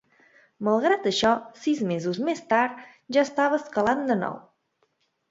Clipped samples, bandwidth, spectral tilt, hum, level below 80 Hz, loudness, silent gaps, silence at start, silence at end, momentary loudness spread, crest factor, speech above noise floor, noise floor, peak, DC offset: under 0.1%; 7.8 kHz; -5 dB/octave; none; -64 dBFS; -25 LUFS; none; 0.6 s; 0.9 s; 7 LU; 18 dB; 47 dB; -71 dBFS; -6 dBFS; under 0.1%